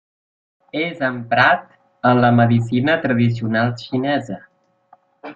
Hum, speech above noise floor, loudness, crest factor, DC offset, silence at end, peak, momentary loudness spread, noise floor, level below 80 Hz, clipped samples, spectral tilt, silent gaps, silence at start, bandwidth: none; 37 dB; -18 LUFS; 18 dB; under 0.1%; 0.05 s; -2 dBFS; 10 LU; -54 dBFS; -58 dBFS; under 0.1%; -8 dB/octave; none; 0.75 s; 7.6 kHz